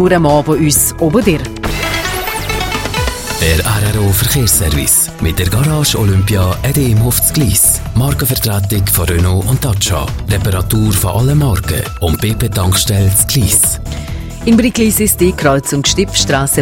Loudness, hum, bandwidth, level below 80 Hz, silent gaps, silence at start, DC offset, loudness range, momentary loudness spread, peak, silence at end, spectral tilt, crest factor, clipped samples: -12 LUFS; none; 17.5 kHz; -24 dBFS; none; 0 s; under 0.1%; 2 LU; 7 LU; 0 dBFS; 0 s; -4 dB/octave; 12 dB; under 0.1%